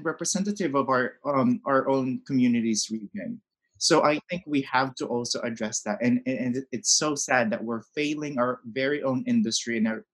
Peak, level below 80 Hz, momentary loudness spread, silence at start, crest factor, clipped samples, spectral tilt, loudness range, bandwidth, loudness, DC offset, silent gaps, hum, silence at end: -6 dBFS; -70 dBFS; 8 LU; 0 s; 20 dB; under 0.1%; -3.5 dB/octave; 1 LU; 12 kHz; -26 LUFS; under 0.1%; none; none; 0.1 s